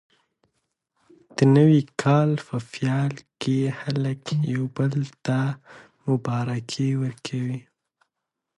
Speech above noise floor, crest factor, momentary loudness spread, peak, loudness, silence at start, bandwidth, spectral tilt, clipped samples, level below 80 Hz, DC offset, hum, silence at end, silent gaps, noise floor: 60 dB; 20 dB; 12 LU; -6 dBFS; -24 LUFS; 1.35 s; 11 kHz; -7.5 dB/octave; under 0.1%; -66 dBFS; under 0.1%; none; 1 s; none; -83 dBFS